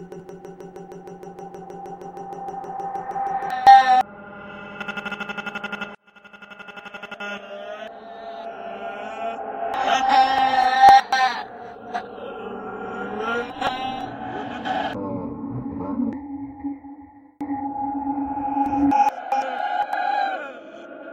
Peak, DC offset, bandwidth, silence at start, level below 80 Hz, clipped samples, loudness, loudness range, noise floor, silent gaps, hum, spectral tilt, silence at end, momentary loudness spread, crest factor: 0 dBFS; under 0.1%; 9.4 kHz; 0 s; -56 dBFS; under 0.1%; -22 LUFS; 15 LU; -47 dBFS; none; none; -4.5 dB/octave; 0 s; 21 LU; 22 dB